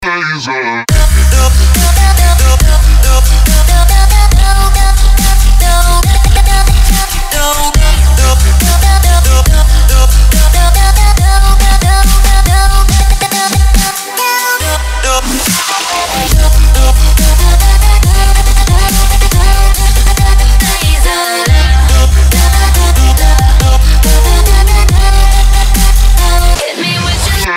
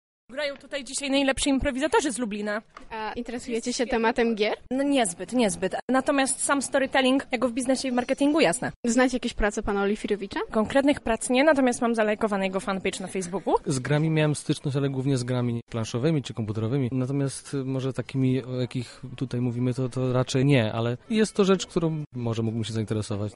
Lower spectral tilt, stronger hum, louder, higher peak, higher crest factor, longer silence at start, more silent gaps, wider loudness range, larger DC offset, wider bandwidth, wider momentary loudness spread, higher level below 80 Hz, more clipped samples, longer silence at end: second, -3.5 dB/octave vs -5 dB/octave; neither; first, -9 LUFS vs -26 LUFS; first, 0 dBFS vs -8 dBFS; second, 6 dB vs 18 dB; second, 0 s vs 0.3 s; second, none vs 5.82-5.88 s, 8.76-8.83 s, 15.62-15.67 s, 22.07-22.11 s; about the same, 2 LU vs 4 LU; neither; first, 16.5 kHz vs 11.5 kHz; second, 4 LU vs 9 LU; first, -6 dBFS vs -48 dBFS; first, 1% vs under 0.1%; about the same, 0 s vs 0 s